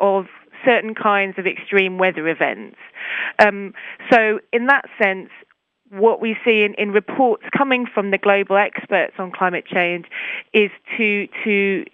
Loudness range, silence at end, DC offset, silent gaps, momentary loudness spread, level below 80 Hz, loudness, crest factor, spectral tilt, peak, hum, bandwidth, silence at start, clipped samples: 2 LU; 0.1 s; under 0.1%; none; 11 LU; -68 dBFS; -18 LUFS; 18 dB; -6.5 dB/octave; 0 dBFS; none; 8 kHz; 0 s; under 0.1%